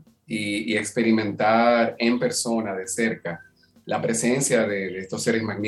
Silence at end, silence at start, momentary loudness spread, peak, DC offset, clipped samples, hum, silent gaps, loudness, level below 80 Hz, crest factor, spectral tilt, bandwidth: 0 s; 0.3 s; 10 LU; -6 dBFS; under 0.1%; under 0.1%; none; none; -23 LUFS; -66 dBFS; 16 dB; -4 dB/octave; 13 kHz